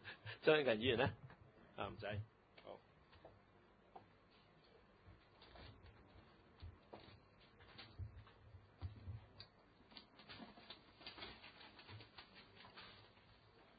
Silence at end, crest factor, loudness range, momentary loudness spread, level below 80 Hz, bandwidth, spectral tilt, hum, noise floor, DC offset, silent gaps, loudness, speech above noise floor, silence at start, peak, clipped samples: 0.45 s; 28 dB; 21 LU; 28 LU; -68 dBFS; 4.9 kHz; -3.5 dB/octave; none; -70 dBFS; under 0.1%; none; -44 LUFS; 31 dB; 0 s; -20 dBFS; under 0.1%